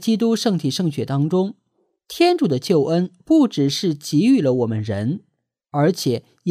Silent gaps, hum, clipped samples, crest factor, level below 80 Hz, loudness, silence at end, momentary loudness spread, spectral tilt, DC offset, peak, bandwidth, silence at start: none; none; under 0.1%; 14 dB; -64 dBFS; -19 LUFS; 0 s; 8 LU; -6 dB/octave; under 0.1%; -4 dBFS; 15.5 kHz; 0 s